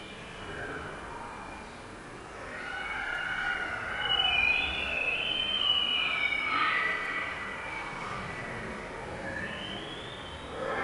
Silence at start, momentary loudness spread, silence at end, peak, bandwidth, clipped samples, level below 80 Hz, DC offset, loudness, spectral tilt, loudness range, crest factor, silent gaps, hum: 0 s; 17 LU; 0 s; -16 dBFS; 11 kHz; under 0.1%; -52 dBFS; under 0.1%; -30 LUFS; -3 dB/octave; 11 LU; 18 dB; none; none